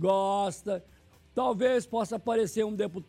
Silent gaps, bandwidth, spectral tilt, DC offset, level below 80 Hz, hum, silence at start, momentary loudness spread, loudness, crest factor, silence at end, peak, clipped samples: none; 15.5 kHz; -5.5 dB/octave; under 0.1%; -64 dBFS; none; 0 s; 9 LU; -29 LUFS; 16 dB; 0.05 s; -14 dBFS; under 0.1%